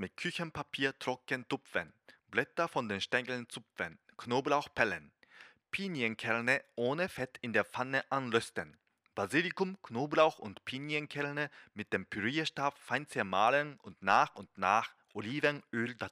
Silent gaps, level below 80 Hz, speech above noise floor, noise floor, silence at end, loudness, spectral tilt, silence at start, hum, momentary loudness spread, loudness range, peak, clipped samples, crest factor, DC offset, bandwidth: none; -74 dBFS; 25 dB; -60 dBFS; 0.05 s; -34 LUFS; -4.5 dB/octave; 0 s; none; 12 LU; 4 LU; -12 dBFS; under 0.1%; 22 dB; under 0.1%; 15.5 kHz